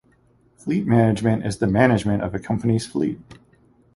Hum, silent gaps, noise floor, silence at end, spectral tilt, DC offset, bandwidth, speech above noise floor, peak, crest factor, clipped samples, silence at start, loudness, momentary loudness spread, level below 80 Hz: none; none; -58 dBFS; 0.6 s; -7 dB/octave; under 0.1%; 11.5 kHz; 38 dB; -2 dBFS; 18 dB; under 0.1%; 0.65 s; -21 LUFS; 8 LU; -46 dBFS